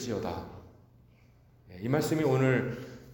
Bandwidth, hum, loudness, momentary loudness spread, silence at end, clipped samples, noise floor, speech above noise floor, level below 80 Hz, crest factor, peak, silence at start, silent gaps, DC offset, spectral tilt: 17 kHz; none; -30 LUFS; 17 LU; 0 s; under 0.1%; -60 dBFS; 31 dB; -60 dBFS; 20 dB; -12 dBFS; 0 s; none; under 0.1%; -6.5 dB/octave